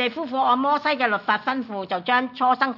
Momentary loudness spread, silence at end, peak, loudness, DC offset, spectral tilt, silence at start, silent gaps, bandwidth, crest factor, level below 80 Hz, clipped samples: 7 LU; 0 s; -6 dBFS; -22 LUFS; under 0.1%; -5.5 dB/octave; 0 s; none; 6 kHz; 16 dB; -76 dBFS; under 0.1%